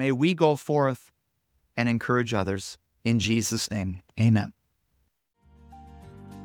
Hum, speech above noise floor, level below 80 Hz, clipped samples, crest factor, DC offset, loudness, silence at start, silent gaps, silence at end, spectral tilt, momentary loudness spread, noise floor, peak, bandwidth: none; 48 dB; -56 dBFS; under 0.1%; 22 dB; under 0.1%; -26 LUFS; 0 s; none; 0 s; -5.5 dB/octave; 14 LU; -73 dBFS; -6 dBFS; 18.5 kHz